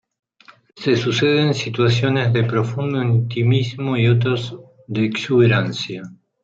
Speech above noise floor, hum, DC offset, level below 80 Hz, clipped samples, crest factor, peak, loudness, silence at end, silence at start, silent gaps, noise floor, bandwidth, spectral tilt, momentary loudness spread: 33 dB; none; under 0.1%; -58 dBFS; under 0.1%; 16 dB; -2 dBFS; -19 LUFS; 0.3 s; 0.75 s; none; -50 dBFS; 7.6 kHz; -6.5 dB/octave; 10 LU